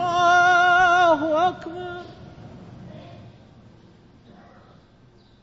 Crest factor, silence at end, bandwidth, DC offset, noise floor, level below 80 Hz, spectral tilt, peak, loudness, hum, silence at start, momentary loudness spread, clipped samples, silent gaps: 14 dB; 2.2 s; 7.8 kHz; under 0.1%; -53 dBFS; -56 dBFS; -4 dB/octave; -8 dBFS; -17 LUFS; none; 0 s; 26 LU; under 0.1%; none